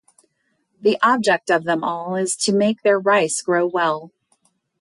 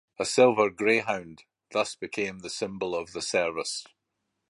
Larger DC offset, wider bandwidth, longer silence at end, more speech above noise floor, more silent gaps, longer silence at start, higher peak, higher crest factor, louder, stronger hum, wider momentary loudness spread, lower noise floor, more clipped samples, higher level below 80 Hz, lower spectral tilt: neither; about the same, 11.5 kHz vs 11.5 kHz; about the same, 0.75 s vs 0.65 s; second, 50 dB vs 54 dB; neither; first, 0.8 s vs 0.2 s; about the same, -6 dBFS vs -8 dBFS; second, 16 dB vs 22 dB; first, -19 LUFS vs -27 LUFS; neither; second, 6 LU vs 12 LU; second, -69 dBFS vs -81 dBFS; neither; about the same, -70 dBFS vs -66 dBFS; about the same, -3.5 dB/octave vs -3.5 dB/octave